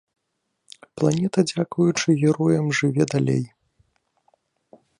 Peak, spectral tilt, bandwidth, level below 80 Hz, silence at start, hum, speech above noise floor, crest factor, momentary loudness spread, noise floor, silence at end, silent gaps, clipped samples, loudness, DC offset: -6 dBFS; -6 dB/octave; 11 kHz; -62 dBFS; 0.95 s; none; 56 dB; 18 dB; 5 LU; -76 dBFS; 1.55 s; none; under 0.1%; -21 LUFS; under 0.1%